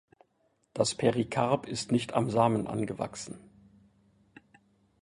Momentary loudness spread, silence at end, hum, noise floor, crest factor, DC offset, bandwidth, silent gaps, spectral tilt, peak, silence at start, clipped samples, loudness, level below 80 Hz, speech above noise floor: 16 LU; 1.65 s; none; -73 dBFS; 22 dB; under 0.1%; 11.5 kHz; none; -5.5 dB/octave; -10 dBFS; 0.75 s; under 0.1%; -29 LUFS; -64 dBFS; 44 dB